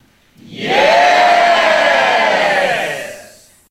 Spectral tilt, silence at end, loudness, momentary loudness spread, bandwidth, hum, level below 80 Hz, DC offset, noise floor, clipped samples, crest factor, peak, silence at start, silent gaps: -2.5 dB/octave; 0.5 s; -11 LUFS; 13 LU; 15 kHz; none; -54 dBFS; under 0.1%; -44 dBFS; under 0.1%; 14 dB; 0 dBFS; 0.5 s; none